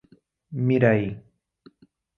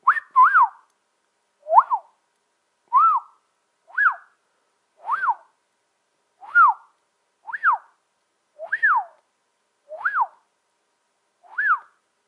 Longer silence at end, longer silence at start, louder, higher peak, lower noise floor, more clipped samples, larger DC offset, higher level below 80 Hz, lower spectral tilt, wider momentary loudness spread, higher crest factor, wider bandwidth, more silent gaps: first, 1 s vs 0.5 s; first, 0.5 s vs 0.05 s; about the same, -22 LUFS vs -20 LUFS; about the same, -4 dBFS vs -2 dBFS; second, -59 dBFS vs -71 dBFS; neither; neither; first, -58 dBFS vs under -90 dBFS; first, -10 dB/octave vs -1 dB/octave; about the same, 18 LU vs 18 LU; about the same, 22 dB vs 22 dB; second, 5 kHz vs 10.5 kHz; neither